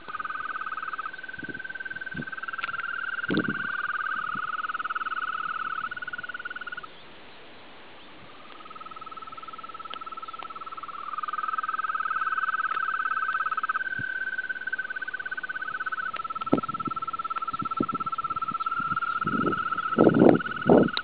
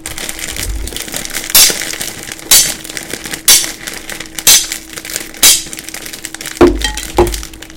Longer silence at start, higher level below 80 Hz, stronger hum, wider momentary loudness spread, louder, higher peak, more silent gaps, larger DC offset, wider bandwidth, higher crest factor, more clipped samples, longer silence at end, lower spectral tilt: about the same, 0 s vs 0 s; second, -62 dBFS vs -28 dBFS; neither; second, 14 LU vs 17 LU; second, -28 LUFS vs -10 LUFS; about the same, 0 dBFS vs 0 dBFS; neither; first, 0.4% vs under 0.1%; second, 4 kHz vs over 20 kHz; first, 28 dB vs 14 dB; second, under 0.1% vs 1%; about the same, 0 s vs 0 s; first, -4 dB/octave vs -1 dB/octave